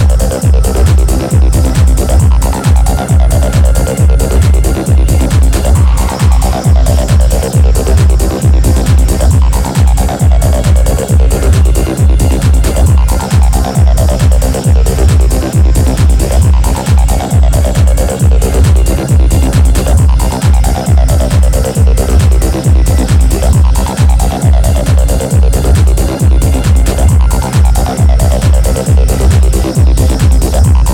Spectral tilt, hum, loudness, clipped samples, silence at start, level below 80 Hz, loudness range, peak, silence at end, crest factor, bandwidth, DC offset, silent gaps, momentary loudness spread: -6 dB/octave; none; -9 LUFS; under 0.1%; 0 s; -8 dBFS; 0 LU; 0 dBFS; 0 s; 6 dB; 16.5 kHz; under 0.1%; none; 2 LU